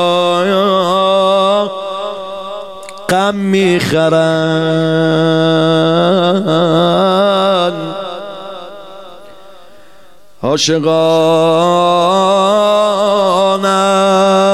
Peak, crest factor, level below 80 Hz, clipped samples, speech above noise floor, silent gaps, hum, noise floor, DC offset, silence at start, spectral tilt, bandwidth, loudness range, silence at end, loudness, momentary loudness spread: -2 dBFS; 10 dB; -56 dBFS; under 0.1%; 35 dB; none; none; -45 dBFS; 0.7%; 0 s; -5 dB/octave; 14 kHz; 6 LU; 0 s; -12 LUFS; 14 LU